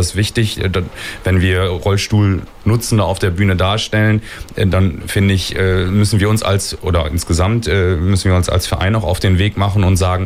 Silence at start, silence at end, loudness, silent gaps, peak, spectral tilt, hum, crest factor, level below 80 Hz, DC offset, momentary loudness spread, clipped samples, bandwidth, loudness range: 0 s; 0 s; -15 LUFS; none; -2 dBFS; -5.5 dB/octave; none; 12 dB; -28 dBFS; under 0.1%; 4 LU; under 0.1%; 15 kHz; 1 LU